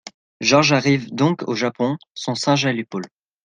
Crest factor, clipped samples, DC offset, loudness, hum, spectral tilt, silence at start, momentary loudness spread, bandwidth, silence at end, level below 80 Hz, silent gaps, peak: 18 dB; under 0.1%; under 0.1%; -19 LUFS; none; -4.5 dB/octave; 0.05 s; 13 LU; 9.6 kHz; 0.4 s; -62 dBFS; 0.14-0.40 s; -2 dBFS